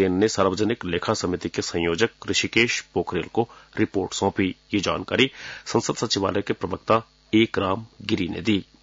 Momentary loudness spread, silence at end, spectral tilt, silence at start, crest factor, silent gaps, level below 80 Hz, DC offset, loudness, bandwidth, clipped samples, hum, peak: 6 LU; 0.2 s; -4.5 dB/octave; 0 s; 18 dB; none; -56 dBFS; under 0.1%; -24 LUFS; 7.8 kHz; under 0.1%; none; -6 dBFS